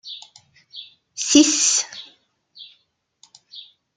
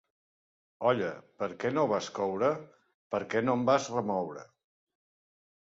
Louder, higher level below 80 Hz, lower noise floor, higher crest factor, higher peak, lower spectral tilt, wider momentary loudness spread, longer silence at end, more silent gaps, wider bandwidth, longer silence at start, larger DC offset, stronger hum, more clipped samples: first, -16 LUFS vs -31 LUFS; about the same, -68 dBFS vs -72 dBFS; second, -66 dBFS vs under -90 dBFS; about the same, 24 dB vs 20 dB; first, 0 dBFS vs -12 dBFS; second, 0 dB/octave vs -5.5 dB/octave; first, 26 LU vs 11 LU; second, 0.35 s vs 1.25 s; second, none vs 2.94-3.10 s; first, 9.6 kHz vs 7.8 kHz; second, 0.05 s vs 0.8 s; neither; neither; neither